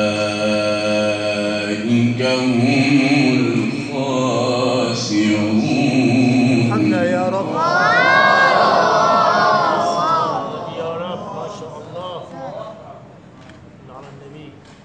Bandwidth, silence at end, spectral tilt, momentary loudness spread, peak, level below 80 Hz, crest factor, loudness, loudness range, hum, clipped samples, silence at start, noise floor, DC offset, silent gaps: 9.8 kHz; 0.35 s; -5.5 dB/octave; 17 LU; -2 dBFS; -58 dBFS; 16 dB; -16 LUFS; 15 LU; none; under 0.1%; 0 s; -40 dBFS; under 0.1%; none